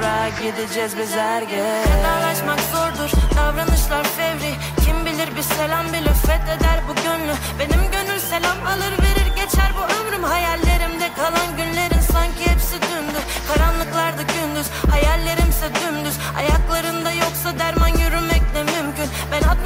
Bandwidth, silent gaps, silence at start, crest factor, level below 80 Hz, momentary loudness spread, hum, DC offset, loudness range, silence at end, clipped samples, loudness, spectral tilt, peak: 16.5 kHz; none; 0 s; 14 dB; -22 dBFS; 5 LU; none; under 0.1%; 1 LU; 0 s; under 0.1%; -19 LUFS; -4.5 dB/octave; -4 dBFS